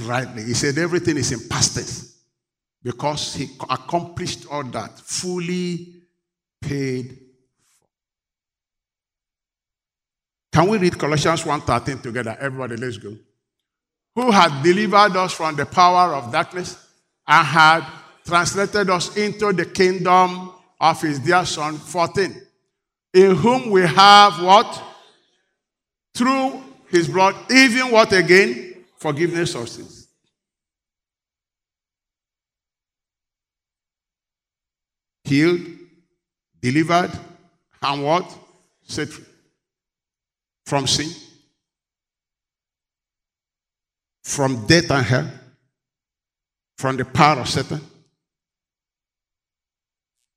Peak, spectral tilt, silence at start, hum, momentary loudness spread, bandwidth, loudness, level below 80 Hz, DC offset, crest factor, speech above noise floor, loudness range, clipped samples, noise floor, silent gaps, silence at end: 0 dBFS; -4 dB/octave; 0 s; none; 18 LU; 15.5 kHz; -18 LUFS; -54 dBFS; under 0.1%; 20 dB; over 72 dB; 13 LU; under 0.1%; under -90 dBFS; none; 2.5 s